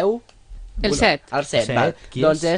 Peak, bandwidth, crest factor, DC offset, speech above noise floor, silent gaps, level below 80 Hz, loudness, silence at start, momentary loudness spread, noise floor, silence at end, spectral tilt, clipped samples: -2 dBFS; 10 kHz; 18 dB; under 0.1%; 20 dB; none; -36 dBFS; -20 LUFS; 0 s; 8 LU; -39 dBFS; 0 s; -4.5 dB/octave; under 0.1%